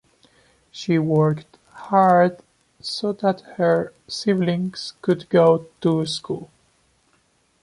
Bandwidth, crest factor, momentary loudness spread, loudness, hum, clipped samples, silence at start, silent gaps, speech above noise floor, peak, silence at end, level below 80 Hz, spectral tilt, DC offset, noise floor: 11.5 kHz; 18 dB; 15 LU; -21 LUFS; none; under 0.1%; 0.75 s; none; 43 dB; -4 dBFS; 1.2 s; -62 dBFS; -6.5 dB/octave; under 0.1%; -63 dBFS